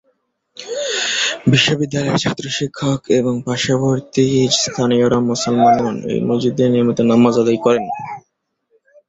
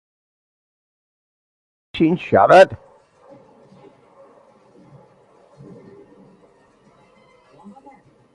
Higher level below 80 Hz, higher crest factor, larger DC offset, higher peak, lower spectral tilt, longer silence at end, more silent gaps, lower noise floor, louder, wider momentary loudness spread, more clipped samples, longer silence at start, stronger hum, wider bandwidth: about the same, -52 dBFS vs -56 dBFS; second, 16 dB vs 22 dB; neither; about the same, -2 dBFS vs 0 dBFS; second, -4.5 dB/octave vs -6.5 dB/octave; second, 0.9 s vs 5.6 s; neither; first, -69 dBFS vs -54 dBFS; about the same, -16 LUFS vs -14 LUFS; second, 8 LU vs 22 LU; neither; second, 0.6 s vs 1.95 s; neither; second, 8 kHz vs 11 kHz